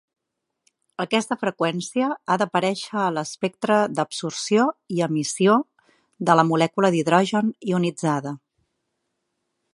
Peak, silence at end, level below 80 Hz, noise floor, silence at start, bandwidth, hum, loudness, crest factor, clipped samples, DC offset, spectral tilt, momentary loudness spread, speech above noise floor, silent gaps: -2 dBFS; 1.35 s; -72 dBFS; -81 dBFS; 1 s; 11.5 kHz; none; -22 LUFS; 22 dB; under 0.1%; under 0.1%; -5 dB/octave; 9 LU; 59 dB; none